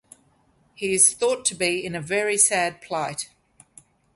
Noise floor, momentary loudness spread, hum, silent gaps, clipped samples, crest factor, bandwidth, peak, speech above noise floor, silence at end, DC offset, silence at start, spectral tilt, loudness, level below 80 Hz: -62 dBFS; 13 LU; none; none; under 0.1%; 22 dB; 12 kHz; -2 dBFS; 39 dB; 0.9 s; under 0.1%; 0.8 s; -1.5 dB/octave; -21 LUFS; -64 dBFS